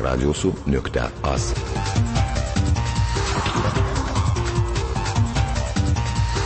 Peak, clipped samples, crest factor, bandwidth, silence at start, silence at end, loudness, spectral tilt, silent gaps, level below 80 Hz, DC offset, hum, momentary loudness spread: -8 dBFS; under 0.1%; 12 dB; 8.8 kHz; 0 s; 0 s; -22 LUFS; -5.5 dB/octave; none; -26 dBFS; under 0.1%; none; 2 LU